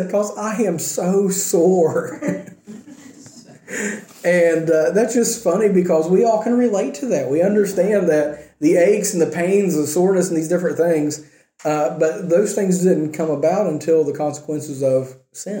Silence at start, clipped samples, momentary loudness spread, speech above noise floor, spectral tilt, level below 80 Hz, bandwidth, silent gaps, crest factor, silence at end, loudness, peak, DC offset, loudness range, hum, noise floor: 0 s; under 0.1%; 10 LU; 25 dB; -5.5 dB/octave; -64 dBFS; 17 kHz; none; 14 dB; 0 s; -18 LUFS; -4 dBFS; under 0.1%; 4 LU; none; -43 dBFS